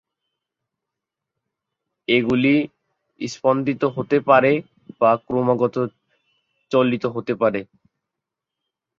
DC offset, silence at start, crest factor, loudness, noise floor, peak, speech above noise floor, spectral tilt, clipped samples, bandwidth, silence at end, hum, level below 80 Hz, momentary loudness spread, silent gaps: under 0.1%; 2.1 s; 20 dB; -20 LUFS; -84 dBFS; -2 dBFS; 65 dB; -6.5 dB/octave; under 0.1%; 7.6 kHz; 1.35 s; none; -60 dBFS; 13 LU; none